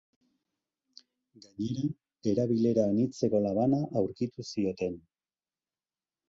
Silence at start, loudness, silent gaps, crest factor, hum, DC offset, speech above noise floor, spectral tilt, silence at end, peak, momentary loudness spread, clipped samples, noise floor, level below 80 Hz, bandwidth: 1.6 s; -30 LUFS; none; 18 dB; none; under 0.1%; over 61 dB; -8 dB/octave; 1.3 s; -14 dBFS; 9 LU; under 0.1%; under -90 dBFS; -64 dBFS; 7.8 kHz